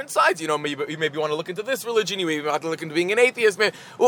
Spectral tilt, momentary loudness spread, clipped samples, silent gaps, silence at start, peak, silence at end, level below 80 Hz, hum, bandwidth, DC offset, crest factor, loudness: -3.5 dB/octave; 8 LU; under 0.1%; none; 0 s; -4 dBFS; 0 s; -78 dBFS; none; over 20 kHz; under 0.1%; 18 dB; -23 LUFS